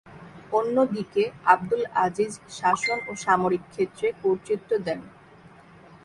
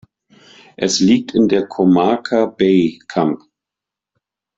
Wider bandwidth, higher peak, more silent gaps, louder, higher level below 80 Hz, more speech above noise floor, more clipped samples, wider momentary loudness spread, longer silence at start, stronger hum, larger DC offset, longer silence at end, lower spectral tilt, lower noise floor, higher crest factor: first, 11.5 kHz vs 7.8 kHz; about the same, -4 dBFS vs -2 dBFS; neither; second, -25 LUFS vs -15 LUFS; second, -62 dBFS vs -56 dBFS; second, 26 dB vs 71 dB; neither; about the same, 8 LU vs 6 LU; second, 0.05 s vs 0.8 s; neither; neither; second, 0.95 s vs 1.2 s; about the same, -5 dB/octave vs -5.5 dB/octave; second, -50 dBFS vs -85 dBFS; first, 22 dB vs 14 dB